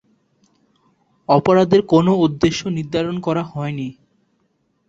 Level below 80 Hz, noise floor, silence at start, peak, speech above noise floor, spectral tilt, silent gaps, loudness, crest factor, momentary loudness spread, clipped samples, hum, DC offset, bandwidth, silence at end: -50 dBFS; -66 dBFS; 1.3 s; -2 dBFS; 49 dB; -7 dB/octave; none; -17 LUFS; 18 dB; 12 LU; under 0.1%; none; under 0.1%; 7.8 kHz; 0.95 s